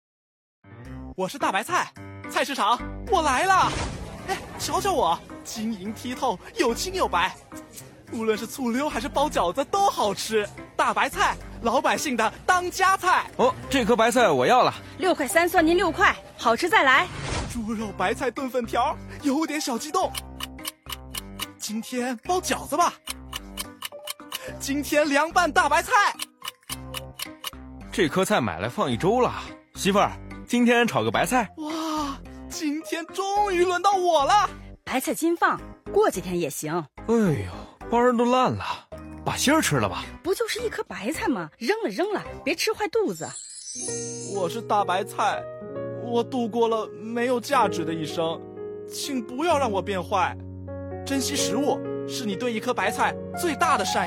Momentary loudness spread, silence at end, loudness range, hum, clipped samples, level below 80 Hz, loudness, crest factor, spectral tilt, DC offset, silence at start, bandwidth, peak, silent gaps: 14 LU; 0 s; 6 LU; none; under 0.1%; -48 dBFS; -24 LUFS; 20 dB; -4 dB/octave; under 0.1%; 0.65 s; 17 kHz; -4 dBFS; none